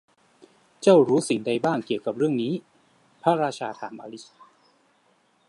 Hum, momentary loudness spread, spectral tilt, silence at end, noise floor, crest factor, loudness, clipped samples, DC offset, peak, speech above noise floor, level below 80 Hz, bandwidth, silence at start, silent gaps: none; 19 LU; -6 dB/octave; 1.25 s; -64 dBFS; 20 dB; -23 LUFS; under 0.1%; under 0.1%; -4 dBFS; 41 dB; -74 dBFS; 11.5 kHz; 0.8 s; none